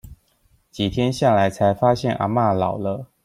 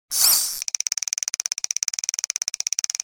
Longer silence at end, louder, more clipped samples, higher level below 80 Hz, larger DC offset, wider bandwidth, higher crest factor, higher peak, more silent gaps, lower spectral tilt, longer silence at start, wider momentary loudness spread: second, 0.2 s vs 0.55 s; about the same, -20 LUFS vs -21 LUFS; neither; first, -48 dBFS vs -66 dBFS; neither; second, 15 kHz vs over 20 kHz; second, 16 dB vs 24 dB; about the same, -4 dBFS vs -2 dBFS; neither; first, -6.5 dB/octave vs 4.5 dB/octave; about the same, 0.05 s vs 0.1 s; about the same, 8 LU vs 8 LU